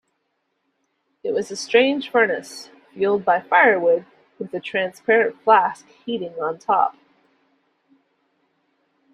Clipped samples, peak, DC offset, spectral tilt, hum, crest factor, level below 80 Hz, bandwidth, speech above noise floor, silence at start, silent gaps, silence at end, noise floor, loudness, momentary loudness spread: under 0.1%; -2 dBFS; under 0.1%; -4 dB/octave; none; 20 dB; -72 dBFS; 12.5 kHz; 53 dB; 1.25 s; none; 2.2 s; -73 dBFS; -20 LUFS; 15 LU